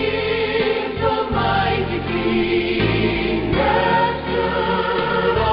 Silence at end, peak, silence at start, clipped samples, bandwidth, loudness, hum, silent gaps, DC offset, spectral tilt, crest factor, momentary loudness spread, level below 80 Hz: 0 s; -4 dBFS; 0 s; under 0.1%; 5.6 kHz; -19 LUFS; none; none; under 0.1%; -11 dB/octave; 14 dB; 3 LU; -36 dBFS